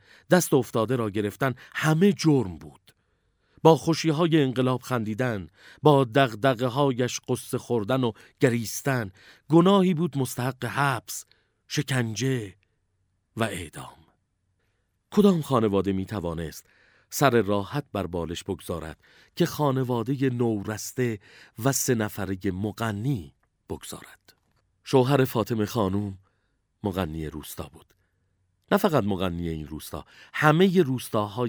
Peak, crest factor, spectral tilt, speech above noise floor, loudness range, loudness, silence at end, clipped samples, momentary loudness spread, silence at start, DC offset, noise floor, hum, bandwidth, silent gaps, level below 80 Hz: -2 dBFS; 24 dB; -5.5 dB/octave; 48 dB; 6 LU; -25 LUFS; 0 s; under 0.1%; 16 LU; 0.3 s; under 0.1%; -73 dBFS; none; over 20 kHz; none; -56 dBFS